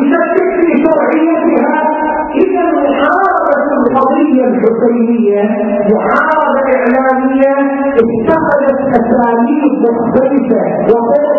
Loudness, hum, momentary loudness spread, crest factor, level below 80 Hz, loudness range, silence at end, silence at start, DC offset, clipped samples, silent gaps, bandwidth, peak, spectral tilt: -10 LUFS; none; 2 LU; 10 dB; -44 dBFS; 0 LU; 0 s; 0 s; under 0.1%; under 0.1%; none; 4.4 kHz; 0 dBFS; -9 dB/octave